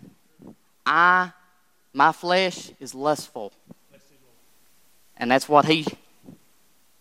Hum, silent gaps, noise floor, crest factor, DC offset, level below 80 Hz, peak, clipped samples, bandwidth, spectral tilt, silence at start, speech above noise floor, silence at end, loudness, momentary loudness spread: none; none; -64 dBFS; 22 dB; under 0.1%; -72 dBFS; -2 dBFS; under 0.1%; 16 kHz; -4 dB/octave; 0.45 s; 43 dB; 0.7 s; -21 LUFS; 19 LU